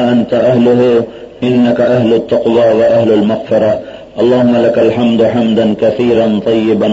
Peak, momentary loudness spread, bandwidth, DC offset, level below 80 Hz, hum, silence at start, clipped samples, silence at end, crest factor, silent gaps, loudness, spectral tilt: 0 dBFS; 5 LU; 7.8 kHz; under 0.1%; -46 dBFS; none; 0 s; under 0.1%; 0 s; 8 dB; none; -10 LUFS; -8 dB/octave